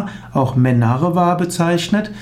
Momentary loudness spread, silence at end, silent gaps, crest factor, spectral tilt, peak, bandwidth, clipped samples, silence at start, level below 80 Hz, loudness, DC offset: 5 LU; 0 s; none; 12 dB; -6.5 dB/octave; -4 dBFS; 15 kHz; under 0.1%; 0 s; -46 dBFS; -16 LUFS; under 0.1%